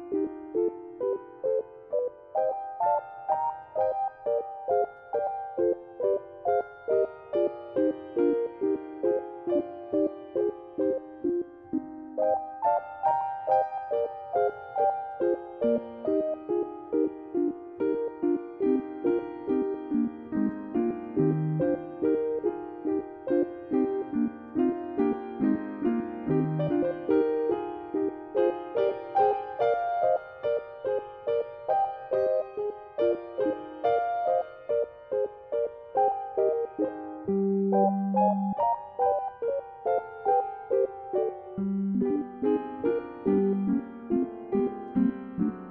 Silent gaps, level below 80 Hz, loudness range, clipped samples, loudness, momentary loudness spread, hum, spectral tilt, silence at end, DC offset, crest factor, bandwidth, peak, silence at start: none; -66 dBFS; 2 LU; under 0.1%; -29 LUFS; 5 LU; none; -11 dB/octave; 0 s; under 0.1%; 16 dB; 5.2 kHz; -12 dBFS; 0 s